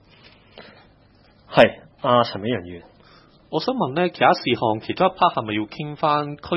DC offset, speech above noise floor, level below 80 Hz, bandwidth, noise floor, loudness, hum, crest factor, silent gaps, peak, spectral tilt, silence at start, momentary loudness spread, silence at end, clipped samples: under 0.1%; 34 dB; -58 dBFS; 7 kHz; -54 dBFS; -21 LUFS; none; 22 dB; none; 0 dBFS; -7 dB/octave; 0.55 s; 11 LU; 0 s; under 0.1%